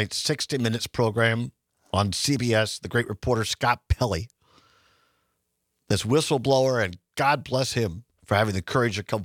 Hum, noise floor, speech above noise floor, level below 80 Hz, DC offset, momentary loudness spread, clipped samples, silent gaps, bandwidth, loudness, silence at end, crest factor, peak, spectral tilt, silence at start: none; -77 dBFS; 52 dB; -44 dBFS; under 0.1%; 7 LU; under 0.1%; none; 16.5 kHz; -25 LUFS; 0 s; 20 dB; -6 dBFS; -4.5 dB/octave; 0 s